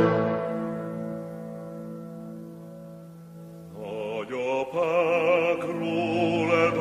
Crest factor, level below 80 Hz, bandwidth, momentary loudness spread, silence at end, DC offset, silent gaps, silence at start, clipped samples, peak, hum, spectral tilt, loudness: 18 dB; -66 dBFS; 13 kHz; 21 LU; 0 s; under 0.1%; none; 0 s; under 0.1%; -8 dBFS; none; -7 dB/octave; -26 LUFS